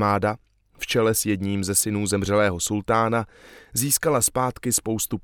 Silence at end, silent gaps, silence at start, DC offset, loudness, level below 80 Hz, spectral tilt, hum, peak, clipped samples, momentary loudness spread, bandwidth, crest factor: 0.05 s; none; 0 s; under 0.1%; -22 LUFS; -50 dBFS; -4 dB/octave; none; -6 dBFS; under 0.1%; 7 LU; 19 kHz; 18 dB